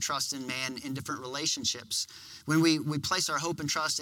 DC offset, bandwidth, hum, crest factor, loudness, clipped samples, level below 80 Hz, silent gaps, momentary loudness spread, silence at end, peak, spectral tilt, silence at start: under 0.1%; 17.5 kHz; none; 20 dB; -30 LUFS; under 0.1%; -68 dBFS; none; 10 LU; 0 s; -12 dBFS; -3 dB/octave; 0 s